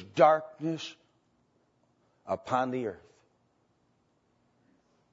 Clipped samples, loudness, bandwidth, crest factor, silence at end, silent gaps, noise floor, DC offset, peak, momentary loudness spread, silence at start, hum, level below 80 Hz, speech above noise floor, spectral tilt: under 0.1%; -29 LUFS; 7.6 kHz; 24 dB; 2.15 s; none; -72 dBFS; under 0.1%; -8 dBFS; 16 LU; 0 s; none; -76 dBFS; 43 dB; -4.5 dB/octave